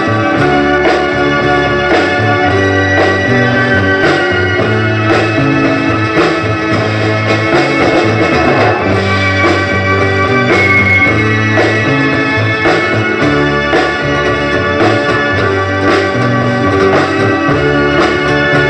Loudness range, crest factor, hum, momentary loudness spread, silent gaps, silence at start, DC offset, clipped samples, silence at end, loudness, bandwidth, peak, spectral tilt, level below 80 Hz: 2 LU; 10 dB; none; 3 LU; none; 0 s; under 0.1%; under 0.1%; 0 s; -10 LUFS; 9 kHz; 0 dBFS; -6 dB/octave; -34 dBFS